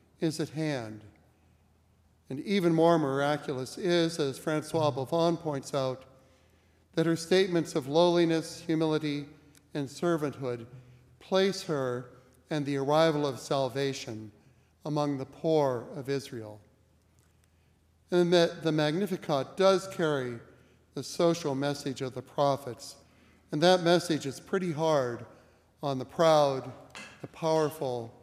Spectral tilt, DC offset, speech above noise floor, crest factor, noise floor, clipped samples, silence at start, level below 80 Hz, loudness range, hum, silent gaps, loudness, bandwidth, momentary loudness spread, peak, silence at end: -5.5 dB/octave; under 0.1%; 37 dB; 20 dB; -65 dBFS; under 0.1%; 0.2 s; -72 dBFS; 4 LU; none; none; -29 LUFS; 15.5 kHz; 16 LU; -10 dBFS; 0.15 s